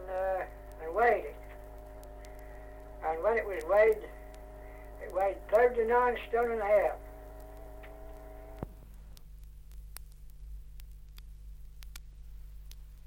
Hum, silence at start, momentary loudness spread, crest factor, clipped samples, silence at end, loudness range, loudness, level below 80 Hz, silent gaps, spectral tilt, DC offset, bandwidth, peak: 50 Hz at -50 dBFS; 0 s; 25 LU; 20 dB; under 0.1%; 0.05 s; 22 LU; -30 LUFS; -48 dBFS; none; -5.5 dB/octave; under 0.1%; 16.5 kHz; -14 dBFS